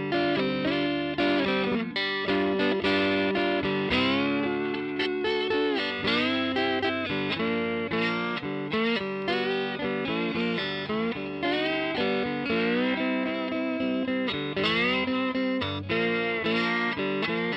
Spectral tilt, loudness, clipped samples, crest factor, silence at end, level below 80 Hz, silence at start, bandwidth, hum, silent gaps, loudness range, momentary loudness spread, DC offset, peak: -6.5 dB/octave; -27 LUFS; under 0.1%; 14 dB; 0 s; -58 dBFS; 0 s; 8.8 kHz; none; none; 2 LU; 5 LU; under 0.1%; -12 dBFS